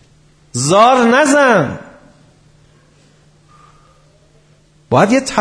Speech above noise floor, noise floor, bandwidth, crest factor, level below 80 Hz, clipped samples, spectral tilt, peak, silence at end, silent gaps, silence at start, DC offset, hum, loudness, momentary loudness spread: 39 dB; -50 dBFS; 10.5 kHz; 16 dB; -52 dBFS; under 0.1%; -4.5 dB/octave; 0 dBFS; 0 s; none; 0.55 s; under 0.1%; none; -11 LUFS; 13 LU